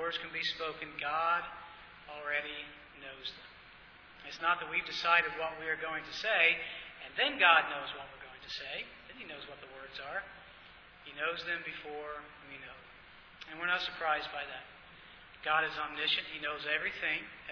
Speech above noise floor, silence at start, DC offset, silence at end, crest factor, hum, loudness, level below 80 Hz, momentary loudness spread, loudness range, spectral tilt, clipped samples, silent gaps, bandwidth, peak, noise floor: 21 dB; 0 s; under 0.1%; 0 s; 26 dB; none; -33 LUFS; -68 dBFS; 24 LU; 11 LU; -2.5 dB/octave; under 0.1%; none; 5.4 kHz; -12 dBFS; -56 dBFS